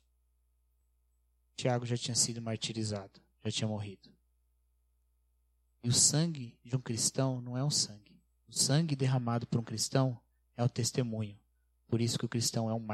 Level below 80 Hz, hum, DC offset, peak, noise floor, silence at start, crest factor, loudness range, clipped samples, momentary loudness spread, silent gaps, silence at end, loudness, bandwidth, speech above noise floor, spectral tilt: -70 dBFS; 60 Hz at -60 dBFS; under 0.1%; -12 dBFS; -74 dBFS; 1.6 s; 22 dB; 5 LU; under 0.1%; 12 LU; none; 0 s; -32 LUFS; 14.5 kHz; 41 dB; -4 dB/octave